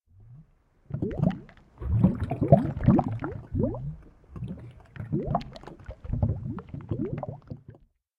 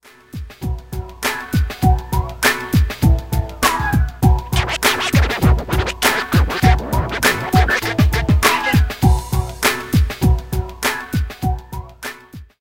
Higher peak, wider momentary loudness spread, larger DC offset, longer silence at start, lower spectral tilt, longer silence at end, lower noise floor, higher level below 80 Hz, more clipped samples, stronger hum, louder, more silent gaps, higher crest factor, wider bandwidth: second, -4 dBFS vs 0 dBFS; first, 22 LU vs 13 LU; second, under 0.1% vs 0.3%; second, 0.2 s vs 0.35 s; first, -11 dB/octave vs -5 dB/octave; first, 0.45 s vs 0.15 s; first, -59 dBFS vs -37 dBFS; second, -42 dBFS vs -22 dBFS; neither; neither; second, -28 LUFS vs -17 LUFS; neither; first, 26 dB vs 16 dB; second, 5.4 kHz vs 17 kHz